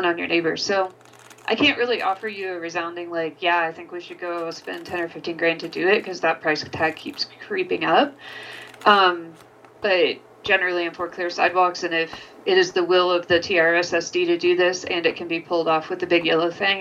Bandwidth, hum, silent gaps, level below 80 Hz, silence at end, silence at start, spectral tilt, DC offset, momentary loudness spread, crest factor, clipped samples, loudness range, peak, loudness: 10 kHz; none; none; -66 dBFS; 0 s; 0 s; -3.5 dB/octave; under 0.1%; 11 LU; 20 dB; under 0.1%; 5 LU; -2 dBFS; -21 LUFS